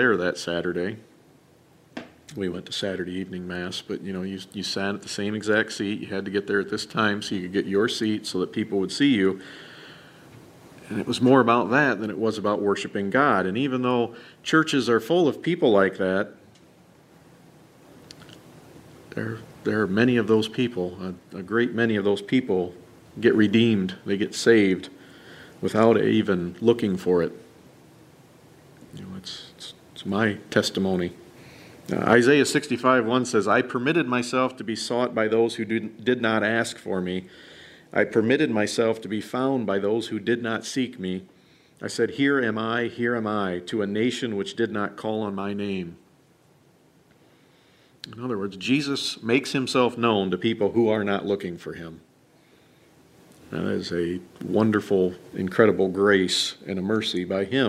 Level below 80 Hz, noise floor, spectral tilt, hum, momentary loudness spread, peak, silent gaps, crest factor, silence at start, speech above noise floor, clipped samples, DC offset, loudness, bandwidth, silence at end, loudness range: -64 dBFS; -58 dBFS; -5 dB/octave; none; 14 LU; -4 dBFS; none; 22 dB; 0 s; 35 dB; under 0.1%; under 0.1%; -24 LUFS; 15 kHz; 0 s; 9 LU